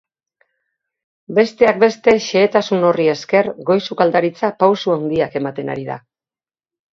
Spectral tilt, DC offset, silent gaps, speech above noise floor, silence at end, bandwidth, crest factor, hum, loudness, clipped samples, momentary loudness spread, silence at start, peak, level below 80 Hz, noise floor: -5.5 dB/octave; under 0.1%; none; over 75 dB; 0.95 s; 7.6 kHz; 18 dB; none; -16 LUFS; under 0.1%; 10 LU; 1.3 s; 0 dBFS; -58 dBFS; under -90 dBFS